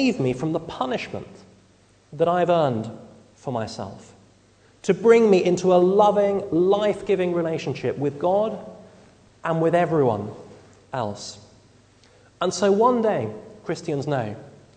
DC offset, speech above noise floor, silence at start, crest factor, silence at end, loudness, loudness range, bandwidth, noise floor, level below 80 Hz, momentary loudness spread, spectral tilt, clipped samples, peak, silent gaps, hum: under 0.1%; 35 dB; 0 s; 20 dB; 0.25 s; -22 LUFS; 7 LU; 9.4 kHz; -56 dBFS; -60 dBFS; 18 LU; -6.5 dB/octave; under 0.1%; -4 dBFS; none; none